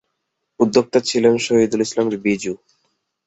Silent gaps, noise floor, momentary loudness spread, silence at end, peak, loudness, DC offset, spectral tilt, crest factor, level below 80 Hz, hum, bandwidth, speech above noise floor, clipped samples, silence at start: none; -75 dBFS; 8 LU; 0.7 s; -2 dBFS; -18 LUFS; under 0.1%; -4.5 dB/octave; 18 dB; -58 dBFS; none; 8.2 kHz; 58 dB; under 0.1%; 0.6 s